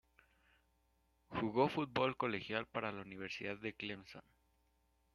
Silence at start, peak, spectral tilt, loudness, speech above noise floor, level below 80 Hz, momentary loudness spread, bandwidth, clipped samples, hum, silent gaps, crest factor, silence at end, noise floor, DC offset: 1.3 s; -18 dBFS; -6.5 dB/octave; -40 LUFS; 37 dB; -74 dBFS; 12 LU; 12 kHz; under 0.1%; none; none; 24 dB; 0.95 s; -77 dBFS; under 0.1%